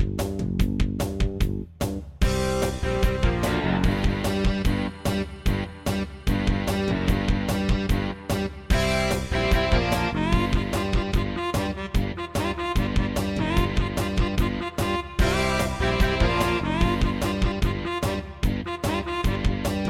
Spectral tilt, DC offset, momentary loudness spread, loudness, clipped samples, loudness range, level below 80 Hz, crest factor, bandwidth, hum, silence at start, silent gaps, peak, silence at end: -5.5 dB/octave; under 0.1%; 5 LU; -25 LUFS; under 0.1%; 2 LU; -28 dBFS; 18 dB; 16.5 kHz; none; 0 s; none; -6 dBFS; 0 s